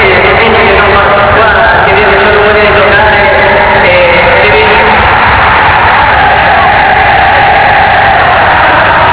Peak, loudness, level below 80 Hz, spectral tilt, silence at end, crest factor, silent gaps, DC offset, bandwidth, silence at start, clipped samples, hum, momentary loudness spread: 0 dBFS; -3 LUFS; -22 dBFS; -8 dB/octave; 0 s; 4 dB; none; 0.7%; 4 kHz; 0 s; 10%; none; 1 LU